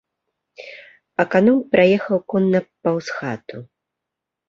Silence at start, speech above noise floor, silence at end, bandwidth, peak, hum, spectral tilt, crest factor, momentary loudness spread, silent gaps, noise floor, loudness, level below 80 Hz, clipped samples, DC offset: 0.6 s; 65 dB; 0.85 s; 7.4 kHz; -2 dBFS; none; -7.5 dB/octave; 20 dB; 23 LU; none; -83 dBFS; -19 LUFS; -60 dBFS; under 0.1%; under 0.1%